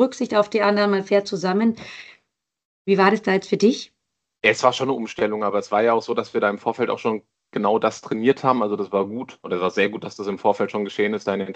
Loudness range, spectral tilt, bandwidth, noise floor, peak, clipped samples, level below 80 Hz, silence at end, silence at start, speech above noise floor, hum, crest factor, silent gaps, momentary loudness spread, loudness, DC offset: 2 LU; -5.5 dB/octave; 8.6 kHz; -71 dBFS; -2 dBFS; under 0.1%; -68 dBFS; 0 s; 0 s; 50 dB; none; 20 dB; 2.65-2.85 s; 11 LU; -21 LUFS; under 0.1%